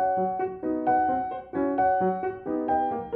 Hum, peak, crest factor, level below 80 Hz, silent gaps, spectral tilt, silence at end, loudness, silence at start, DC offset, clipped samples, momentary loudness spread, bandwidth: none; -14 dBFS; 12 dB; -58 dBFS; none; -10.5 dB/octave; 0 s; -26 LUFS; 0 s; under 0.1%; under 0.1%; 7 LU; 4 kHz